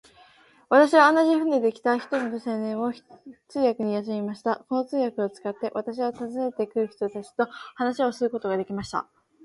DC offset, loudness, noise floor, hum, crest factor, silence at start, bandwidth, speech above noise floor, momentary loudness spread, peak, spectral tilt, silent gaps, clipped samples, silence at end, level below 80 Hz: under 0.1%; -25 LUFS; -56 dBFS; none; 22 dB; 0.7 s; 11.5 kHz; 31 dB; 12 LU; -4 dBFS; -5.5 dB/octave; none; under 0.1%; 0.4 s; -68 dBFS